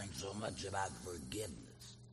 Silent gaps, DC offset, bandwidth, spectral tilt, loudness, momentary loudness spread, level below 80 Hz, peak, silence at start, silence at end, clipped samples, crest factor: none; under 0.1%; 13 kHz; -4 dB/octave; -44 LUFS; 12 LU; -62 dBFS; -26 dBFS; 0 s; 0 s; under 0.1%; 20 dB